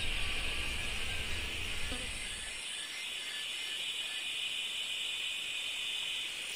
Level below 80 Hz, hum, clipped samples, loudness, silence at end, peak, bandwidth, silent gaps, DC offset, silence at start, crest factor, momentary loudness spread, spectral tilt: -46 dBFS; none; under 0.1%; -36 LUFS; 0 s; -22 dBFS; 16 kHz; none; under 0.1%; 0 s; 16 dB; 4 LU; -1 dB/octave